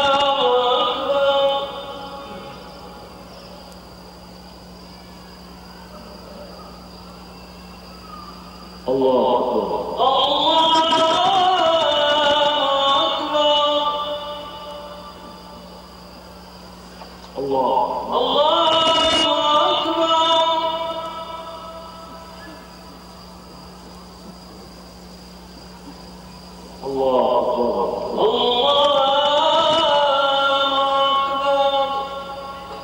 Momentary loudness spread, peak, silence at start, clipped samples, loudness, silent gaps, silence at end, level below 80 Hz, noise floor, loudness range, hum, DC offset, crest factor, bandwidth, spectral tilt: 24 LU; -8 dBFS; 0 s; under 0.1%; -17 LUFS; none; 0 s; -50 dBFS; -40 dBFS; 23 LU; none; under 0.1%; 14 dB; 16 kHz; -3.5 dB/octave